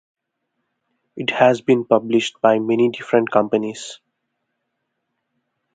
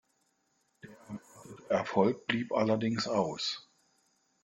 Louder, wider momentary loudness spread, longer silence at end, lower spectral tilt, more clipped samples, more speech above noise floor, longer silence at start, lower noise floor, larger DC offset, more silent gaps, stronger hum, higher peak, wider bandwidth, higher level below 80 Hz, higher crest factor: first, -18 LUFS vs -31 LUFS; second, 10 LU vs 18 LU; first, 1.8 s vs 0.85 s; about the same, -5.5 dB/octave vs -5 dB/octave; neither; first, 58 dB vs 45 dB; first, 1.15 s vs 0.85 s; about the same, -76 dBFS vs -75 dBFS; neither; neither; neither; first, 0 dBFS vs -12 dBFS; second, 9.4 kHz vs 11.5 kHz; about the same, -68 dBFS vs -72 dBFS; about the same, 20 dB vs 22 dB